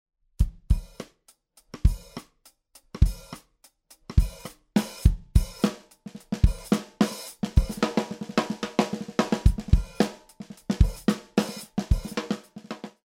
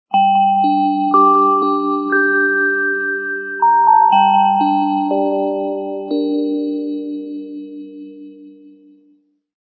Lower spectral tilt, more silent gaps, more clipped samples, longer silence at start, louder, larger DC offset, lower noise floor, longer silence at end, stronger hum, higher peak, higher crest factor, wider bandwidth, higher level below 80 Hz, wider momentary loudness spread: second, -6.5 dB/octave vs -8 dB/octave; neither; neither; first, 0.4 s vs 0.1 s; second, -27 LUFS vs -15 LUFS; neither; first, -62 dBFS vs -56 dBFS; second, 0.2 s vs 1.1 s; neither; about the same, -4 dBFS vs -2 dBFS; first, 22 dB vs 14 dB; first, 16 kHz vs 4.8 kHz; first, -28 dBFS vs -86 dBFS; first, 20 LU vs 17 LU